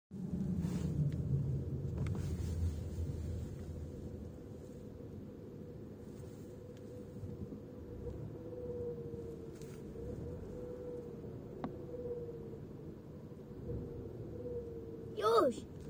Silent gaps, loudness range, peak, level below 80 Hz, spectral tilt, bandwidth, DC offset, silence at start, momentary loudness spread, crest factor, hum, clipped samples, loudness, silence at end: none; 10 LU; -18 dBFS; -54 dBFS; -8 dB/octave; over 20 kHz; under 0.1%; 0.1 s; 13 LU; 22 dB; none; under 0.1%; -42 LUFS; 0 s